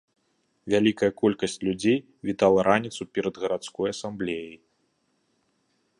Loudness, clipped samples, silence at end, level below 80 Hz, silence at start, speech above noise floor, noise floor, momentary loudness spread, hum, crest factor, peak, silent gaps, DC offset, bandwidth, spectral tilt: -25 LUFS; under 0.1%; 1.45 s; -60 dBFS; 0.65 s; 47 dB; -71 dBFS; 10 LU; none; 20 dB; -6 dBFS; none; under 0.1%; 11 kHz; -5.5 dB/octave